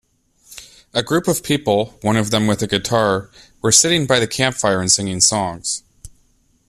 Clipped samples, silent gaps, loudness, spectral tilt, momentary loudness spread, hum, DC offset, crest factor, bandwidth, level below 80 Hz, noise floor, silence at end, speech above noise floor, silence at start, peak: under 0.1%; none; -17 LUFS; -3 dB/octave; 11 LU; none; under 0.1%; 18 dB; 14.5 kHz; -48 dBFS; -58 dBFS; 0.6 s; 41 dB; 0.5 s; 0 dBFS